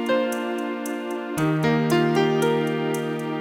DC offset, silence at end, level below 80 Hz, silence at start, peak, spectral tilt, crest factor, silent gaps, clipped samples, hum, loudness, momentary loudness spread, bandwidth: under 0.1%; 0 s; -60 dBFS; 0 s; -8 dBFS; -6 dB/octave; 14 dB; none; under 0.1%; none; -23 LUFS; 8 LU; 17 kHz